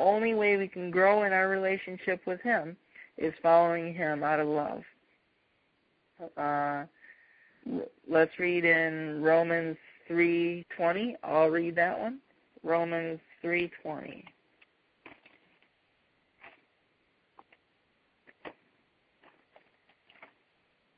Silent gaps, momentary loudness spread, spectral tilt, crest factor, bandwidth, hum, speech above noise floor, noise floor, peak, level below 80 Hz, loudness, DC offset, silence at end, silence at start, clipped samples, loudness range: none; 21 LU; -9.5 dB/octave; 22 dB; 5 kHz; none; 44 dB; -73 dBFS; -10 dBFS; -74 dBFS; -29 LUFS; under 0.1%; 2.45 s; 0 s; under 0.1%; 10 LU